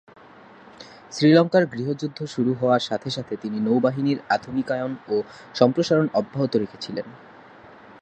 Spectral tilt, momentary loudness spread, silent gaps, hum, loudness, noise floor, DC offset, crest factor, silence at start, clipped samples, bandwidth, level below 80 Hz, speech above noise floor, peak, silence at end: -6.5 dB/octave; 14 LU; none; none; -23 LUFS; -48 dBFS; under 0.1%; 20 dB; 0.8 s; under 0.1%; 8.8 kHz; -64 dBFS; 25 dB; -2 dBFS; 0.1 s